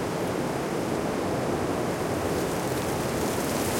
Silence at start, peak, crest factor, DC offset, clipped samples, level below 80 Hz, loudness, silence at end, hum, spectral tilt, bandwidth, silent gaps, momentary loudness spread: 0 s; -14 dBFS; 14 dB; under 0.1%; under 0.1%; -48 dBFS; -28 LUFS; 0 s; none; -5 dB/octave; 16.5 kHz; none; 1 LU